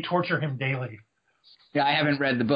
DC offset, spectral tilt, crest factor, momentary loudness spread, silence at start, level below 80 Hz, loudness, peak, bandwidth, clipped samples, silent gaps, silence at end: under 0.1%; -9.5 dB/octave; 18 dB; 9 LU; 0 s; -68 dBFS; -26 LUFS; -10 dBFS; 5.2 kHz; under 0.1%; none; 0 s